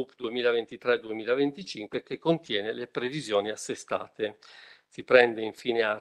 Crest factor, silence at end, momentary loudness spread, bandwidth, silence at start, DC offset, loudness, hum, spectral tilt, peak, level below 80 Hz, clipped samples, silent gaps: 24 dB; 0 s; 13 LU; 12 kHz; 0 s; under 0.1%; -28 LUFS; none; -4.5 dB/octave; -4 dBFS; -74 dBFS; under 0.1%; none